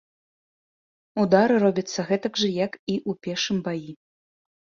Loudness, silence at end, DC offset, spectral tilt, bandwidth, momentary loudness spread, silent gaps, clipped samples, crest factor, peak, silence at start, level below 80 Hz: -24 LUFS; 0.75 s; under 0.1%; -5 dB/octave; 7.4 kHz; 13 LU; 2.79-2.87 s; under 0.1%; 22 dB; -4 dBFS; 1.15 s; -66 dBFS